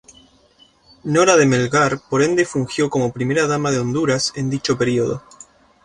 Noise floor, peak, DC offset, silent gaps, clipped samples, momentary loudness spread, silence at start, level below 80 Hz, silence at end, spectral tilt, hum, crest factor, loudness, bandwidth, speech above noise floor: -54 dBFS; -2 dBFS; under 0.1%; none; under 0.1%; 7 LU; 1.05 s; -52 dBFS; 0.65 s; -5 dB/octave; none; 18 dB; -18 LUFS; 11.5 kHz; 36 dB